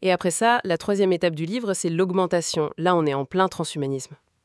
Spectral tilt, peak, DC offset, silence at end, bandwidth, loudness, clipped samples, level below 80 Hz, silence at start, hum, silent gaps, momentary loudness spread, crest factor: -4.5 dB/octave; -6 dBFS; under 0.1%; 0.3 s; 12 kHz; -23 LUFS; under 0.1%; -64 dBFS; 0 s; none; none; 7 LU; 18 dB